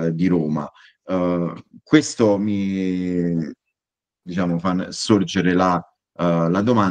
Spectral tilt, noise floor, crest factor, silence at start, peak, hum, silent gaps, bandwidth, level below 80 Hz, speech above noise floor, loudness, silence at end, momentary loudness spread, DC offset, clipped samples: -6 dB/octave; -89 dBFS; 20 dB; 0 s; 0 dBFS; none; none; 9.6 kHz; -56 dBFS; 69 dB; -20 LUFS; 0 s; 9 LU; under 0.1%; under 0.1%